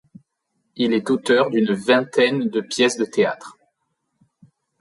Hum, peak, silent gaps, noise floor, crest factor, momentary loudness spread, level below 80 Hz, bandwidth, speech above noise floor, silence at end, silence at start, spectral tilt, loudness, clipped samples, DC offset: none; -4 dBFS; none; -74 dBFS; 18 dB; 6 LU; -68 dBFS; 11.5 kHz; 55 dB; 1.3 s; 0.75 s; -4.5 dB/octave; -19 LUFS; under 0.1%; under 0.1%